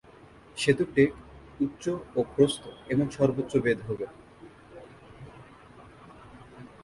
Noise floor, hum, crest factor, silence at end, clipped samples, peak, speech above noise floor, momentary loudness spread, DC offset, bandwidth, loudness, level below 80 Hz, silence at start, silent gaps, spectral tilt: -52 dBFS; none; 22 dB; 0.2 s; under 0.1%; -8 dBFS; 26 dB; 24 LU; under 0.1%; 11.5 kHz; -27 LUFS; -58 dBFS; 0.55 s; none; -6 dB/octave